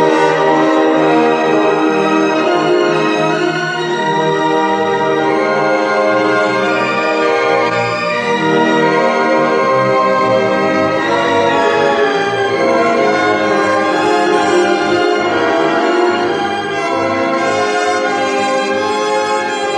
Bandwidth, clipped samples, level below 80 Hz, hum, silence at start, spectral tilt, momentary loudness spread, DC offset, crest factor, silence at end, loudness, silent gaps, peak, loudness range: 10.5 kHz; under 0.1%; -60 dBFS; none; 0 s; -4.5 dB/octave; 4 LU; under 0.1%; 12 dB; 0 s; -13 LUFS; none; 0 dBFS; 2 LU